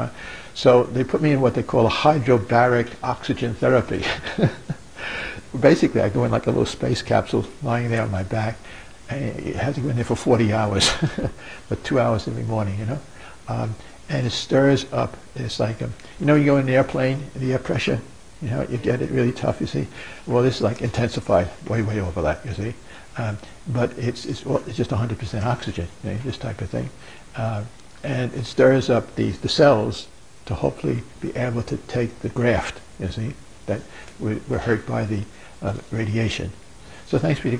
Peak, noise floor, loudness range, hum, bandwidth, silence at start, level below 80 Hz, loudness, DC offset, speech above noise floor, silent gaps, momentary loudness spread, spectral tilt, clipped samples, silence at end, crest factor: -2 dBFS; -43 dBFS; 6 LU; none; 10.5 kHz; 0 s; -44 dBFS; -22 LUFS; 0.7%; 22 dB; none; 14 LU; -6 dB/octave; under 0.1%; 0 s; 20 dB